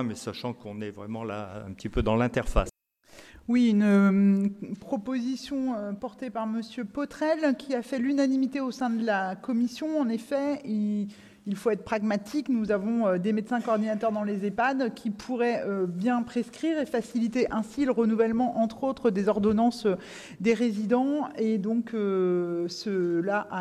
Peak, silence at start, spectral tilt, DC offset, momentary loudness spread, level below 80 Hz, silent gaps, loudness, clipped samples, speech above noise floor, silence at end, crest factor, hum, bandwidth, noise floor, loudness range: -10 dBFS; 0 s; -7 dB/octave; under 0.1%; 11 LU; -46 dBFS; none; -28 LUFS; under 0.1%; 27 dB; 0 s; 18 dB; none; 12.5 kHz; -54 dBFS; 4 LU